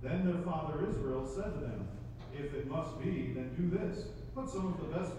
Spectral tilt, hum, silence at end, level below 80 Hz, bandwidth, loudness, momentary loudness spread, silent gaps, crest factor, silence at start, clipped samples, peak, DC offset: -8 dB/octave; none; 0 s; -50 dBFS; 10.5 kHz; -38 LUFS; 9 LU; none; 16 dB; 0 s; under 0.1%; -22 dBFS; under 0.1%